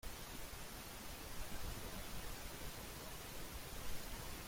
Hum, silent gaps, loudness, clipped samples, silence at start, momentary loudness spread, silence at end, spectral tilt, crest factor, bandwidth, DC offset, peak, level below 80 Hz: none; none; -50 LUFS; under 0.1%; 0.05 s; 2 LU; 0 s; -3 dB/octave; 14 dB; 16.5 kHz; under 0.1%; -32 dBFS; -54 dBFS